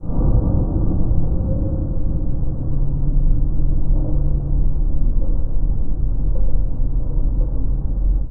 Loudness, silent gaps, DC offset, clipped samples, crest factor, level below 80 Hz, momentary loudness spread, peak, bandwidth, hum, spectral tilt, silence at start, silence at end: -23 LUFS; none; under 0.1%; under 0.1%; 12 dB; -18 dBFS; 4 LU; -2 dBFS; 1.4 kHz; none; -15 dB/octave; 0 s; 0 s